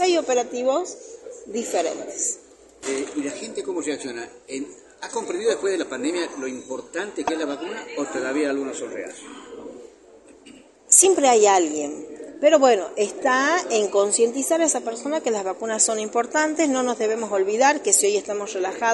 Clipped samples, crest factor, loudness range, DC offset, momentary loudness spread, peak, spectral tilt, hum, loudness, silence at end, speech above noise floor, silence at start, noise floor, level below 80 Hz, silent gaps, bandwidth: under 0.1%; 22 dB; 10 LU; under 0.1%; 17 LU; 0 dBFS; -1.5 dB/octave; none; -22 LUFS; 0 s; 27 dB; 0 s; -49 dBFS; -68 dBFS; none; 11.5 kHz